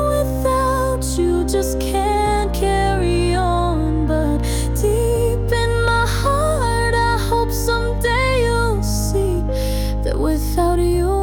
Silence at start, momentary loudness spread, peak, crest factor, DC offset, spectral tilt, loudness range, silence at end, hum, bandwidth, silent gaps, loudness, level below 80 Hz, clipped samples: 0 s; 3 LU; -6 dBFS; 12 dB; under 0.1%; -5.5 dB/octave; 1 LU; 0 s; none; 18 kHz; none; -18 LUFS; -22 dBFS; under 0.1%